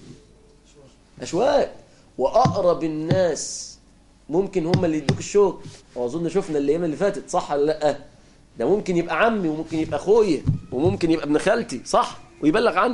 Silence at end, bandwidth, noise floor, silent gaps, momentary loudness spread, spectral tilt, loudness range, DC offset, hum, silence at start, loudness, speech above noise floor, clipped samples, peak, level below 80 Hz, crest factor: 0 s; 11.5 kHz; -53 dBFS; none; 9 LU; -5.5 dB/octave; 3 LU; under 0.1%; none; 0 s; -22 LUFS; 32 dB; under 0.1%; -6 dBFS; -46 dBFS; 16 dB